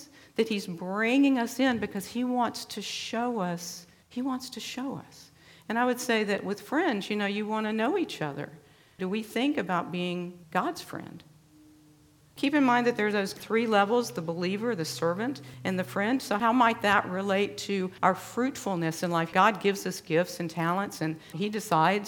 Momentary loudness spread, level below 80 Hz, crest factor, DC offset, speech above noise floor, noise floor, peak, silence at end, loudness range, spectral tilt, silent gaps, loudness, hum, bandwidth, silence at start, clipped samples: 11 LU; -70 dBFS; 22 dB; under 0.1%; 31 dB; -59 dBFS; -6 dBFS; 0 s; 6 LU; -5 dB/octave; none; -28 LUFS; none; 18.5 kHz; 0 s; under 0.1%